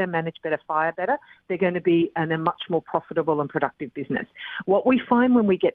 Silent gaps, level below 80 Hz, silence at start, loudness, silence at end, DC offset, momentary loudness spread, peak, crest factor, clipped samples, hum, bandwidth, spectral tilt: none; -64 dBFS; 0 s; -24 LUFS; 0.05 s; under 0.1%; 10 LU; -4 dBFS; 18 dB; under 0.1%; none; 4.3 kHz; -10 dB/octave